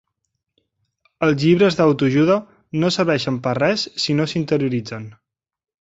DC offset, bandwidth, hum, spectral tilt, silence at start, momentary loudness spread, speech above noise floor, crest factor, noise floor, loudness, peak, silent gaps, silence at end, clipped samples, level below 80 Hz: under 0.1%; 8 kHz; none; -6 dB/octave; 1.2 s; 11 LU; 58 dB; 18 dB; -76 dBFS; -18 LUFS; -2 dBFS; none; 0.85 s; under 0.1%; -56 dBFS